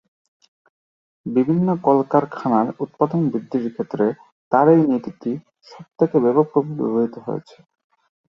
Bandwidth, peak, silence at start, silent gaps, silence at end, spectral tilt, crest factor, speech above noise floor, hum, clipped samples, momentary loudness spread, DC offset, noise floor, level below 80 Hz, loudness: 6.8 kHz; -2 dBFS; 1.25 s; 4.32-4.51 s; 0.9 s; -10.5 dB/octave; 20 dB; over 71 dB; none; under 0.1%; 12 LU; under 0.1%; under -90 dBFS; -64 dBFS; -20 LUFS